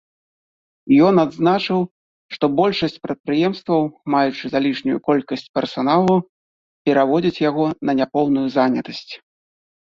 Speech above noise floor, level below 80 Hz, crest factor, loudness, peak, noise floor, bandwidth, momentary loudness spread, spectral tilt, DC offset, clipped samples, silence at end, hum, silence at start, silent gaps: over 72 dB; -58 dBFS; 16 dB; -19 LUFS; -4 dBFS; under -90 dBFS; 7.2 kHz; 9 LU; -7.5 dB/octave; under 0.1%; under 0.1%; 0.75 s; none; 0.85 s; 1.91-2.29 s, 3.20-3.24 s, 5.49-5.54 s, 6.29-6.85 s